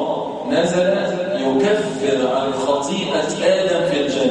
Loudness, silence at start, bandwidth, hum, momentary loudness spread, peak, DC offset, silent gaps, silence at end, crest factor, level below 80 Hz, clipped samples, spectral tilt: -19 LUFS; 0 s; 10.5 kHz; none; 4 LU; -4 dBFS; under 0.1%; none; 0 s; 14 dB; -56 dBFS; under 0.1%; -4.5 dB/octave